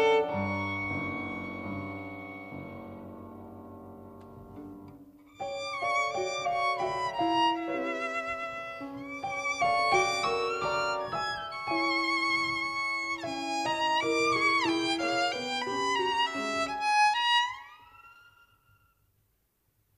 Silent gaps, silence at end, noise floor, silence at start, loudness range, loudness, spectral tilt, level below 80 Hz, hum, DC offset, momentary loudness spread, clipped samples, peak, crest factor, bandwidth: none; 1.8 s; -74 dBFS; 0 s; 12 LU; -29 LUFS; -3 dB/octave; -64 dBFS; none; under 0.1%; 21 LU; under 0.1%; -12 dBFS; 18 dB; 15 kHz